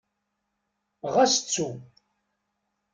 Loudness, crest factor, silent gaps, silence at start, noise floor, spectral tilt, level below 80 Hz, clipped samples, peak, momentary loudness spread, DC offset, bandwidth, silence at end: -24 LUFS; 20 dB; none; 1.05 s; -80 dBFS; -2.5 dB/octave; -72 dBFS; under 0.1%; -10 dBFS; 17 LU; under 0.1%; 10 kHz; 1.1 s